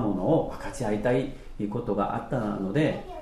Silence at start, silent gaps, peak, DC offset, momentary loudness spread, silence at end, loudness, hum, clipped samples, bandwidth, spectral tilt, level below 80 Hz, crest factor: 0 s; none; -12 dBFS; under 0.1%; 8 LU; 0 s; -28 LUFS; none; under 0.1%; 13 kHz; -7.5 dB/octave; -44 dBFS; 14 dB